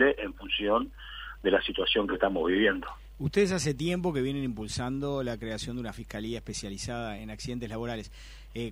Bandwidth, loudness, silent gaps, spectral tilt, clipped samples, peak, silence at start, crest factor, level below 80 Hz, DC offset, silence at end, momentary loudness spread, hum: 16 kHz; -30 LUFS; none; -4.5 dB/octave; under 0.1%; -10 dBFS; 0 s; 20 dB; -48 dBFS; under 0.1%; 0 s; 12 LU; none